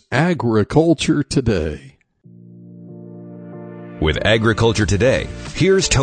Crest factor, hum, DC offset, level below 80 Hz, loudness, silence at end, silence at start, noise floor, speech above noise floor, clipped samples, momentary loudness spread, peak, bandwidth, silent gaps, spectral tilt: 18 dB; none; under 0.1%; -34 dBFS; -17 LUFS; 0 s; 0.1 s; -46 dBFS; 30 dB; under 0.1%; 21 LU; -2 dBFS; 9.6 kHz; none; -5 dB/octave